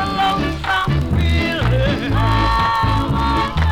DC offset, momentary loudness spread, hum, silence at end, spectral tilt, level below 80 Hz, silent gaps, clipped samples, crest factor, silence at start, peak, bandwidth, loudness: under 0.1%; 2 LU; none; 0 s; -6.5 dB/octave; -24 dBFS; none; under 0.1%; 12 dB; 0 s; -4 dBFS; 16 kHz; -17 LUFS